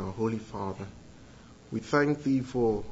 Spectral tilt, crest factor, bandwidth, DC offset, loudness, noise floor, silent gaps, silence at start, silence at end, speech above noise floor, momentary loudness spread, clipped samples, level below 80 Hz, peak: -7 dB/octave; 20 dB; 8 kHz; under 0.1%; -30 LUFS; -51 dBFS; none; 0 s; 0 s; 22 dB; 12 LU; under 0.1%; -54 dBFS; -12 dBFS